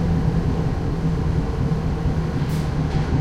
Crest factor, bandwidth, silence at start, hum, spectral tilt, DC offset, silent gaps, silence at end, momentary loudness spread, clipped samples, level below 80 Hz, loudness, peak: 12 dB; 11.5 kHz; 0 s; none; -8 dB/octave; under 0.1%; none; 0 s; 2 LU; under 0.1%; -28 dBFS; -23 LUFS; -8 dBFS